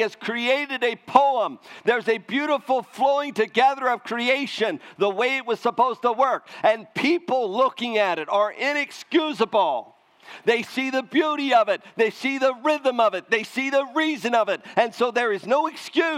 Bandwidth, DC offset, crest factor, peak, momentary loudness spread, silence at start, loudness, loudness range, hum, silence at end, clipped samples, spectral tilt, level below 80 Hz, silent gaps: 15.5 kHz; under 0.1%; 22 dB; 0 dBFS; 5 LU; 0 s; -23 LUFS; 1 LU; none; 0 s; under 0.1%; -4 dB/octave; -80 dBFS; none